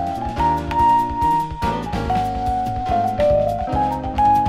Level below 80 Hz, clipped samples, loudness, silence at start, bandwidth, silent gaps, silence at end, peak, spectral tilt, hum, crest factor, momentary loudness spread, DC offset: -32 dBFS; under 0.1%; -20 LUFS; 0 s; 15.5 kHz; none; 0 s; -6 dBFS; -7 dB/octave; none; 12 dB; 6 LU; under 0.1%